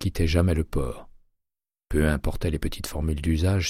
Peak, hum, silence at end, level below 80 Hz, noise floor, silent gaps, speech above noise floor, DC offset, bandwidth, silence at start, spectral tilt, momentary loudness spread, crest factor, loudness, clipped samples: -8 dBFS; none; 0 s; -32 dBFS; -87 dBFS; none; 63 dB; under 0.1%; 15.5 kHz; 0 s; -6 dB/octave; 8 LU; 18 dB; -26 LUFS; under 0.1%